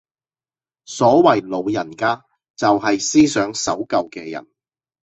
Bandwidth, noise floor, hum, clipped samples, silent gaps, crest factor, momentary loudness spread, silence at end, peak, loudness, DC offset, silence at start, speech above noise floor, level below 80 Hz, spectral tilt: 8.4 kHz; under -90 dBFS; none; under 0.1%; 2.50-2.54 s; 18 dB; 16 LU; 0.65 s; -2 dBFS; -18 LUFS; under 0.1%; 0.9 s; over 73 dB; -56 dBFS; -4 dB/octave